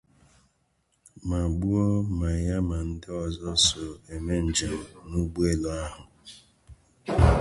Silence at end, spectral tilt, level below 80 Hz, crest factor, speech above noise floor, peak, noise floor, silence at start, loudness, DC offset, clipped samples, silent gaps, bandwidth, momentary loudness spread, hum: 0 s; -5 dB/octave; -34 dBFS; 22 dB; 44 dB; -6 dBFS; -71 dBFS; 1.15 s; -27 LUFS; under 0.1%; under 0.1%; none; 11.5 kHz; 17 LU; none